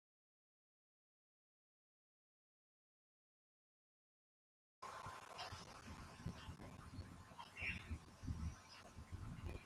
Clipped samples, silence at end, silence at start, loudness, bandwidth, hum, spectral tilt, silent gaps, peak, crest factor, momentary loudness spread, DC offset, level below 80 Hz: under 0.1%; 0 s; 4.8 s; -53 LUFS; 13.5 kHz; none; -5 dB/octave; none; -34 dBFS; 22 dB; 11 LU; under 0.1%; -64 dBFS